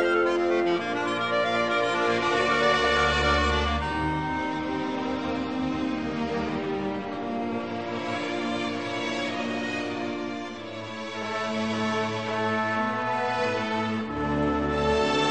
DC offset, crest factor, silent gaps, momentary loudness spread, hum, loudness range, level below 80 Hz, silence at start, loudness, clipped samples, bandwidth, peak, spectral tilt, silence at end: 0.2%; 16 dB; none; 9 LU; none; 6 LU; -42 dBFS; 0 s; -26 LUFS; under 0.1%; 9 kHz; -10 dBFS; -5 dB/octave; 0 s